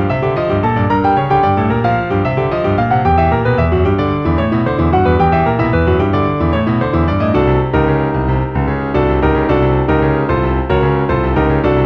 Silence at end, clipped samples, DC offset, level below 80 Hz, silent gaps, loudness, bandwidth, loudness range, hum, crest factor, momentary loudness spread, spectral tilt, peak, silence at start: 0 s; under 0.1%; under 0.1%; -24 dBFS; none; -14 LUFS; 6.2 kHz; 1 LU; none; 12 dB; 3 LU; -9.5 dB/octave; 0 dBFS; 0 s